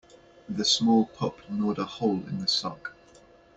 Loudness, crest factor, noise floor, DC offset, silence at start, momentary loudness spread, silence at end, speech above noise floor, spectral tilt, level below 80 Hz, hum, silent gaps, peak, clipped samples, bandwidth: -27 LUFS; 18 dB; -55 dBFS; under 0.1%; 0.5 s; 14 LU; 0.65 s; 28 dB; -4 dB/octave; -64 dBFS; none; none; -10 dBFS; under 0.1%; 8.4 kHz